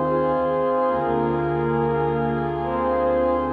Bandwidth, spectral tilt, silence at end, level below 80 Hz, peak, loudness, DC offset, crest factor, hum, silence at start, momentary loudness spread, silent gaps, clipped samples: 4.8 kHz; -10 dB/octave; 0 s; -42 dBFS; -12 dBFS; -22 LUFS; under 0.1%; 10 dB; none; 0 s; 3 LU; none; under 0.1%